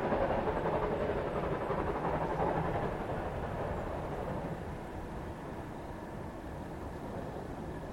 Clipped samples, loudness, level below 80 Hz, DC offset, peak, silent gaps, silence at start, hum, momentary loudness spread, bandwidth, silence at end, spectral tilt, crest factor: under 0.1%; -37 LUFS; -48 dBFS; under 0.1%; -18 dBFS; none; 0 s; none; 10 LU; 16.5 kHz; 0 s; -7.5 dB/octave; 18 dB